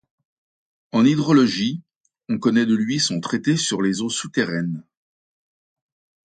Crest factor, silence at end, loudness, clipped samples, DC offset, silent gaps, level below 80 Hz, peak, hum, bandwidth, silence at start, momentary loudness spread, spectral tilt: 18 dB; 1.45 s; -20 LUFS; under 0.1%; under 0.1%; 1.96-2.04 s; -64 dBFS; -4 dBFS; none; 9.4 kHz; 0.95 s; 10 LU; -4.5 dB/octave